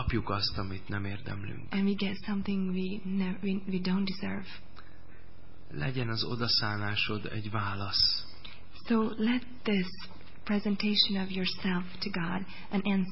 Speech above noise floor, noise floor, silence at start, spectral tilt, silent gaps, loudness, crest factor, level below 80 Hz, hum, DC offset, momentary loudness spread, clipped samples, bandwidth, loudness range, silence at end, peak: 23 dB; -54 dBFS; 0 s; -8.5 dB/octave; none; -31 LUFS; 18 dB; -52 dBFS; none; 2%; 13 LU; under 0.1%; 5.8 kHz; 4 LU; 0 s; -14 dBFS